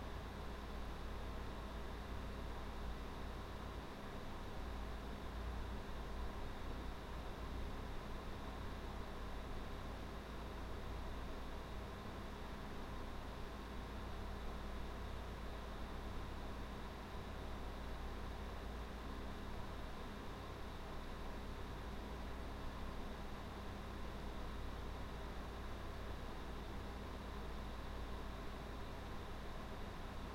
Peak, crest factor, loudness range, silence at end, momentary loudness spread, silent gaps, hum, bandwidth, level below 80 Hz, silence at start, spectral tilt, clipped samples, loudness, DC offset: -34 dBFS; 14 dB; 1 LU; 0 s; 1 LU; none; none; 16.5 kHz; -50 dBFS; 0 s; -6 dB/octave; under 0.1%; -50 LUFS; under 0.1%